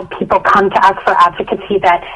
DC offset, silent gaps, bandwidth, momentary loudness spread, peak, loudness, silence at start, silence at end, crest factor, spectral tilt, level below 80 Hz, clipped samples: under 0.1%; none; 11 kHz; 6 LU; 0 dBFS; -11 LUFS; 0 s; 0 s; 12 dB; -5.5 dB/octave; -42 dBFS; under 0.1%